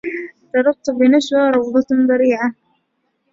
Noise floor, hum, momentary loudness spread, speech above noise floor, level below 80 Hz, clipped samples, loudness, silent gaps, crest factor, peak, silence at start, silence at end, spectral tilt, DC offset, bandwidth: -68 dBFS; none; 9 LU; 54 dB; -62 dBFS; under 0.1%; -16 LUFS; none; 14 dB; -2 dBFS; 0.05 s; 0.8 s; -4.5 dB/octave; under 0.1%; 7.6 kHz